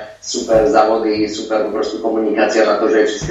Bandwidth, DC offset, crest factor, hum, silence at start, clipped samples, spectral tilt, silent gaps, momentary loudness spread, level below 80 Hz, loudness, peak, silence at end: 8.2 kHz; under 0.1%; 14 dB; none; 0 s; under 0.1%; -4 dB/octave; none; 7 LU; -42 dBFS; -15 LUFS; 0 dBFS; 0 s